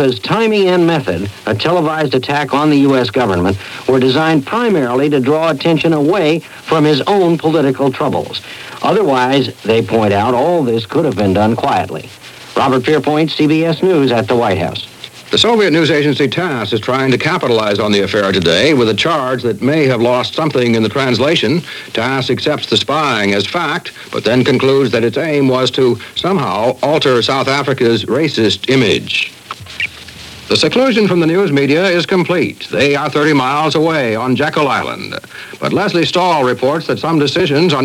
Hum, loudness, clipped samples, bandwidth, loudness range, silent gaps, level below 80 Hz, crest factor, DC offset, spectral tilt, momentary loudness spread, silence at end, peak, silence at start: none; -13 LUFS; under 0.1%; 16.5 kHz; 2 LU; none; -50 dBFS; 12 dB; under 0.1%; -5.5 dB/octave; 8 LU; 0 s; 0 dBFS; 0 s